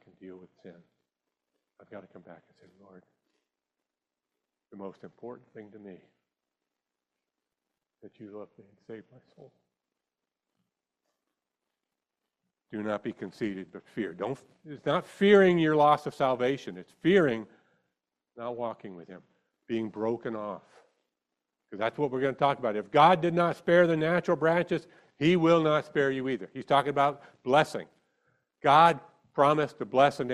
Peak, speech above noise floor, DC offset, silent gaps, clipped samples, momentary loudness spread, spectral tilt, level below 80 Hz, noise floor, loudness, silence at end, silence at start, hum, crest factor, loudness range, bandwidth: -8 dBFS; 62 dB; under 0.1%; none; under 0.1%; 24 LU; -6.5 dB/octave; -72 dBFS; -89 dBFS; -27 LUFS; 0 s; 0.2 s; none; 22 dB; 24 LU; 12 kHz